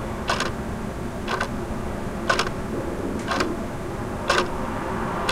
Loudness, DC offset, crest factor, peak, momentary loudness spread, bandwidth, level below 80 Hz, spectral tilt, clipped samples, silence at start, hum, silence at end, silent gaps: -26 LUFS; under 0.1%; 20 dB; -6 dBFS; 8 LU; 16 kHz; -36 dBFS; -4.5 dB/octave; under 0.1%; 0 s; none; 0 s; none